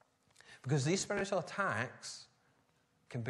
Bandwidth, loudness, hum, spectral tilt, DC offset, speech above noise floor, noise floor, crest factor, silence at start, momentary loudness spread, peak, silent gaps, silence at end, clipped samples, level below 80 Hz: 12 kHz; -37 LUFS; none; -4.5 dB/octave; under 0.1%; 38 dB; -74 dBFS; 20 dB; 0.5 s; 14 LU; -20 dBFS; none; 0 s; under 0.1%; -74 dBFS